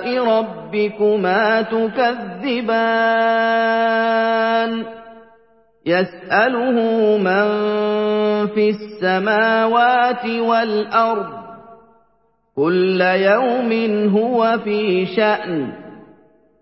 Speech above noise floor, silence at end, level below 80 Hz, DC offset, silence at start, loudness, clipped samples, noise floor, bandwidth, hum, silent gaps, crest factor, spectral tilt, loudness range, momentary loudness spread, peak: 45 dB; 0.6 s; -64 dBFS; under 0.1%; 0 s; -17 LUFS; under 0.1%; -62 dBFS; 5.8 kHz; none; none; 16 dB; -10 dB/octave; 2 LU; 7 LU; -2 dBFS